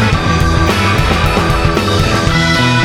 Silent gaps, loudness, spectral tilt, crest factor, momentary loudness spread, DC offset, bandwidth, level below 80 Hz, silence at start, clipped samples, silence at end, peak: none; -12 LUFS; -5 dB/octave; 10 dB; 2 LU; under 0.1%; 17.5 kHz; -20 dBFS; 0 s; under 0.1%; 0 s; 0 dBFS